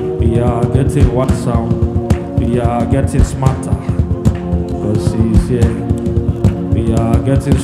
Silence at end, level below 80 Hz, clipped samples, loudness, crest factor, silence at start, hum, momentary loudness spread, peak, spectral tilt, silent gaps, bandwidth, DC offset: 0 s; -22 dBFS; under 0.1%; -14 LUFS; 12 dB; 0 s; none; 4 LU; 0 dBFS; -8 dB/octave; none; 12.5 kHz; under 0.1%